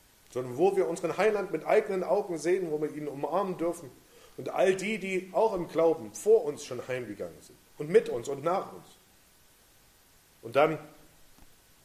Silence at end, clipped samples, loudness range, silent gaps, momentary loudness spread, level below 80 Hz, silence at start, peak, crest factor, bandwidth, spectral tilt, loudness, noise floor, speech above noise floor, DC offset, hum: 0.4 s; under 0.1%; 5 LU; none; 14 LU; -66 dBFS; 0.3 s; -10 dBFS; 20 dB; 15 kHz; -5.5 dB/octave; -29 LUFS; -61 dBFS; 32 dB; under 0.1%; none